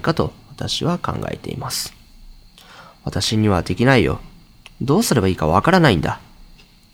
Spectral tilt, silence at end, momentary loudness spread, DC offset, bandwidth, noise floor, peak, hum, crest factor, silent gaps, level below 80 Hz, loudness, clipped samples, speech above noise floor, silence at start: -5 dB/octave; 0.5 s; 14 LU; under 0.1%; 19 kHz; -46 dBFS; 0 dBFS; none; 20 dB; none; -40 dBFS; -19 LUFS; under 0.1%; 29 dB; 0 s